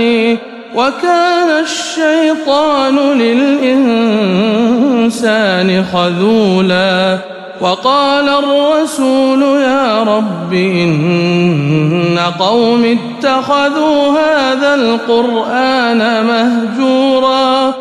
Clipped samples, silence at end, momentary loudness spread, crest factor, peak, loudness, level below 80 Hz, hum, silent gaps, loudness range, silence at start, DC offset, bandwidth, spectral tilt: under 0.1%; 0 s; 3 LU; 10 dB; 0 dBFS; -11 LUFS; -54 dBFS; none; none; 1 LU; 0 s; under 0.1%; 12.5 kHz; -5.5 dB/octave